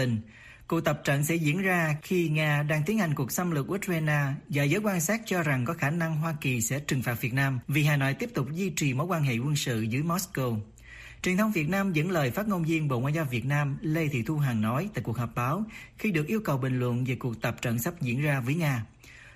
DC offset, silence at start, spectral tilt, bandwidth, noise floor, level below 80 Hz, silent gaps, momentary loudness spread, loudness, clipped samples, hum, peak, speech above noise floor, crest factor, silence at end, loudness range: under 0.1%; 0 s; -5.5 dB/octave; 15.5 kHz; -47 dBFS; -56 dBFS; none; 6 LU; -28 LUFS; under 0.1%; none; -12 dBFS; 20 dB; 16 dB; 0.05 s; 2 LU